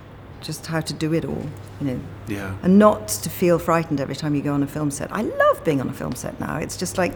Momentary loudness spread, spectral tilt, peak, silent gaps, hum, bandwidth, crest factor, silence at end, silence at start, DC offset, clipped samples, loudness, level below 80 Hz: 14 LU; -5.5 dB/octave; -2 dBFS; none; none; over 20 kHz; 20 dB; 0 s; 0 s; under 0.1%; under 0.1%; -22 LUFS; -46 dBFS